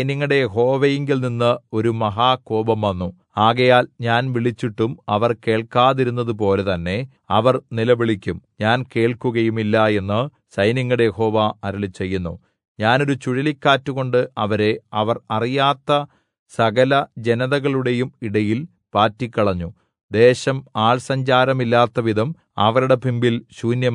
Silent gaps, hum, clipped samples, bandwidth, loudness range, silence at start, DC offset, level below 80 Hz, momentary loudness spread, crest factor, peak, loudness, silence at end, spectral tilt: 12.68-12.75 s, 16.39-16.46 s, 20.03-20.09 s; none; under 0.1%; 11 kHz; 2 LU; 0 s; under 0.1%; -58 dBFS; 8 LU; 16 dB; -2 dBFS; -19 LUFS; 0 s; -6.5 dB/octave